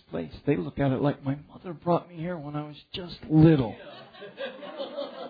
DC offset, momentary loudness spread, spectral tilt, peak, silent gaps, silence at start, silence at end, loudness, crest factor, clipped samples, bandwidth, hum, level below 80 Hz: under 0.1%; 19 LU; -10.5 dB/octave; -6 dBFS; none; 0.1 s; 0 s; -27 LUFS; 20 dB; under 0.1%; 5 kHz; none; -52 dBFS